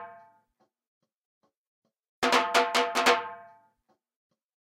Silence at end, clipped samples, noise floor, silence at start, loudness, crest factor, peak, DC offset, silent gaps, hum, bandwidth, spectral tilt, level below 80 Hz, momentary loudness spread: 1.2 s; under 0.1%; -74 dBFS; 0 s; -25 LUFS; 24 dB; -8 dBFS; under 0.1%; 0.88-1.01 s, 1.16-1.41 s, 1.57-1.82 s, 2.09-2.22 s; none; 16 kHz; -1 dB/octave; -72 dBFS; 7 LU